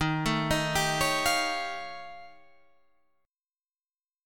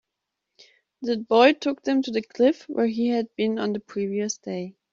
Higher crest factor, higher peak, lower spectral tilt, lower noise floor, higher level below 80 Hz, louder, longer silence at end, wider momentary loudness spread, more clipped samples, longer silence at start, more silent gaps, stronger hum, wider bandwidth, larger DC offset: about the same, 20 dB vs 20 dB; second, -12 dBFS vs -4 dBFS; about the same, -3.5 dB/octave vs -3.5 dB/octave; first, under -90 dBFS vs -83 dBFS; first, -50 dBFS vs -70 dBFS; second, -27 LUFS vs -24 LUFS; second, 0 s vs 0.2 s; first, 17 LU vs 12 LU; neither; second, 0 s vs 1 s; first, 3.75-3.80 s vs none; neither; first, 19 kHz vs 7.6 kHz; neither